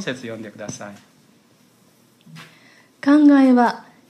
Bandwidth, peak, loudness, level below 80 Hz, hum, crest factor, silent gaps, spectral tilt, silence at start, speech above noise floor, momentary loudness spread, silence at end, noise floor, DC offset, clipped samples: 9.6 kHz; -4 dBFS; -15 LUFS; -72 dBFS; none; 16 dB; none; -5.5 dB/octave; 0 s; 38 dB; 21 LU; 0.3 s; -55 dBFS; under 0.1%; under 0.1%